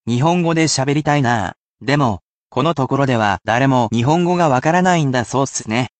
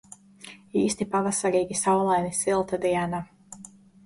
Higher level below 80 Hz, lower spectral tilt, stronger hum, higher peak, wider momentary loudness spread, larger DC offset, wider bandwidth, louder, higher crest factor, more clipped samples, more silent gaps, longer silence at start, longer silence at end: first, -52 dBFS vs -60 dBFS; about the same, -5.5 dB/octave vs -4.5 dB/octave; neither; first, -2 dBFS vs -12 dBFS; second, 6 LU vs 21 LU; neither; second, 9 kHz vs 11.5 kHz; first, -16 LUFS vs -25 LUFS; about the same, 14 dB vs 14 dB; neither; first, 1.57-1.75 s, 2.23-2.50 s vs none; second, 0.05 s vs 0.45 s; second, 0.1 s vs 0.45 s